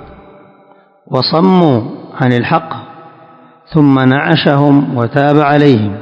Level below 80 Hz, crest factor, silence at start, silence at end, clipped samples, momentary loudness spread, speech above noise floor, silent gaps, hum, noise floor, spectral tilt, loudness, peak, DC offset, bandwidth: -48 dBFS; 12 dB; 0 s; 0 s; 0.8%; 8 LU; 36 dB; none; none; -45 dBFS; -9 dB/octave; -11 LUFS; 0 dBFS; under 0.1%; 6.6 kHz